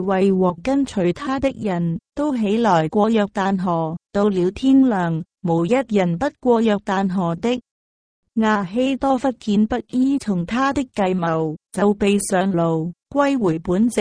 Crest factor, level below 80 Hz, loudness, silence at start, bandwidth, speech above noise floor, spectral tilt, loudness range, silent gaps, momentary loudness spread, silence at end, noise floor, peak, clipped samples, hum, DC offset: 14 dB; -48 dBFS; -20 LUFS; 0 s; 11 kHz; over 71 dB; -6.5 dB/octave; 2 LU; 7.71-8.23 s; 6 LU; 0 s; under -90 dBFS; -4 dBFS; under 0.1%; none; under 0.1%